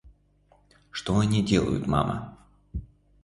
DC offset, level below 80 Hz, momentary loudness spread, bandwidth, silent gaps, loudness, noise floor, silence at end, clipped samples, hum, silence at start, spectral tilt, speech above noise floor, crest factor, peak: under 0.1%; -44 dBFS; 17 LU; 11.5 kHz; none; -26 LUFS; -62 dBFS; 0.4 s; under 0.1%; 50 Hz at -45 dBFS; 0.05 s; -6.5 dB/octave; 38 dB; 20 dB; -8 dBFS